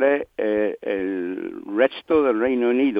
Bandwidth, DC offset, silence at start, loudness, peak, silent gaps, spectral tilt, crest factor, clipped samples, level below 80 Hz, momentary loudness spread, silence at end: 5 kHz; under 0.1%; 0 s; -22 LUFS; -4 dBFS; none; -8 dB/octave; 18 dB; under 0.1%; -60 dBFS; 8 LU; 0 s